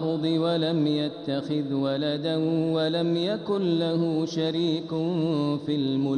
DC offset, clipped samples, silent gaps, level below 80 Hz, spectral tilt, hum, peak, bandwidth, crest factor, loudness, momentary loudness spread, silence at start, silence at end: under 0.1%; under 0.1%; none; -68 dBFS; -7.5 dB/octave; none; -14 dBFS; 9.6 kHz; 12 dB; -26 LUFS; 3 LU; 0 s; 0 s